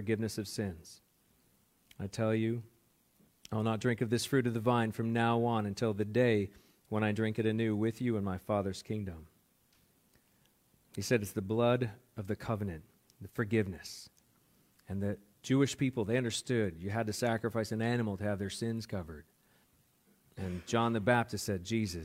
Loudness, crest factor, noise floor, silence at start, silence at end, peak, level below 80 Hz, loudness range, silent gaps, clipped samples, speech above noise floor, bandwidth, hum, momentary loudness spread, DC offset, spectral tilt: -34 LUFS; 20 dB; -70 dBFS; 0 s; 0 s; -14 dBFS; -66 dBFS; 7 LU; none; under 0.1%; 37 dB; 16.5 kHz; none; 14 LU; under 0.1%; -6 dB/octave